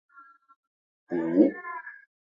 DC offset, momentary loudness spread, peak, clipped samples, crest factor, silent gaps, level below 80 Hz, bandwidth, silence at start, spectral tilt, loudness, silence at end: under 0.1%; 17 LU; -8 dBFS; under 0.1%; 22 dB; 0.56-1.07 s; -76 dBFS; 5 kHz; 0.2 s; -10 dB/octave; -26 LUFS; 0.4 s